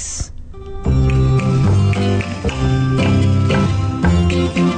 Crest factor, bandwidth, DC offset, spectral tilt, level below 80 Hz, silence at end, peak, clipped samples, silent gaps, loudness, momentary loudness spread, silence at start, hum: 10 dB; 9.4 kHz; under 0.1%; -6.5 dB/octave; -24 dBFS; 0 s; -6 dBFS; under 0.1%; none; -16 LUFS; 11 LU; 0 s; none